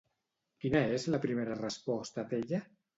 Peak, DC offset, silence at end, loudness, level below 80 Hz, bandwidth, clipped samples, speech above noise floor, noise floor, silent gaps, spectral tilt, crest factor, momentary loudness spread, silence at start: -16 dBFS; under 0.1%; 0.35 s; -35 LUFS; -64 dBFS; 8 kHz; under 0.1%; 51 dB; -84 dBFS; none; -6 dB/octave; 20 dB; 7 LU; 0.65 s